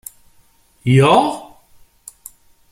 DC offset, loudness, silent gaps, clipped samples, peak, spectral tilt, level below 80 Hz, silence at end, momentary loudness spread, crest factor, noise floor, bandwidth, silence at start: under 0.1%; -14 LUFS; none; under 0.1%; 0 dBFS; -6 dB/octave; -52 dBFS; 1.25 s; 26 LU; 18 dB; -53 dBFS; 15.5 kHz; 0.85 s